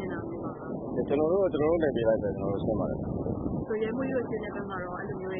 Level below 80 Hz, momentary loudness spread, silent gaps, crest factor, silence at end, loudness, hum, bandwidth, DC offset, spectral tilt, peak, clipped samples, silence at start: -48 dBFS; 9 LU; none; 16 dB; 0 s; -30 LUFS; none; 4 kHz; under 0.1%; -11.5 dB/octave; -14 dBFS; under 0.1%; 0 s